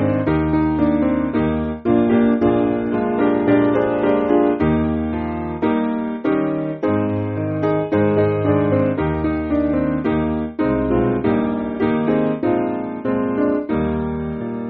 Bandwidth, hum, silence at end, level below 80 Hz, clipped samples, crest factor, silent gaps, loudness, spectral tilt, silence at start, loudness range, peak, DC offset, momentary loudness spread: 4.4 kHz; none; 0 s; -38 dBFS; under 0.1%; 14 dB; none; -19 LUFS; -7.5 dB/octave; 0 s; 3 LU; -4 dBFS; under 0.1%; 6 LU